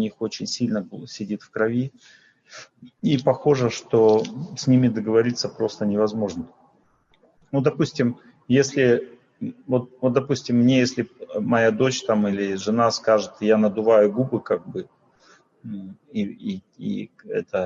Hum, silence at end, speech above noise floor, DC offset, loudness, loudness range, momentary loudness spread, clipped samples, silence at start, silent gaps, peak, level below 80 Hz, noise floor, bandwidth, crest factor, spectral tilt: none; 0 s; 39 dB; under 0.1%; -22 LUFS; 5 LU; 16 LU; under 0.1%; 0 s; none; -4 dBFS; -64 dBFS; -61 dBFS; 7.6 kHz; 18 dB; -6 dB/octave